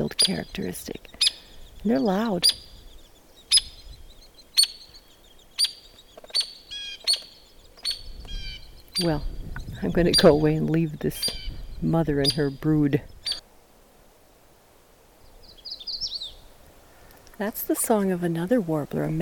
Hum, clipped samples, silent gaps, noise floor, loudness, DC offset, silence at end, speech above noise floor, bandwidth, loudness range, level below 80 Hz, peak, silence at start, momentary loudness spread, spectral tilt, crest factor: none; under 0.1%; none; -55 dBFS; -24 LUFS; under 0.1%; 0 s; 32 dB; 19 kHz; 12 LU; -42 dBFS; -6 dBFS; 0 s; 18 LU; -4 dB/octave; 20 dB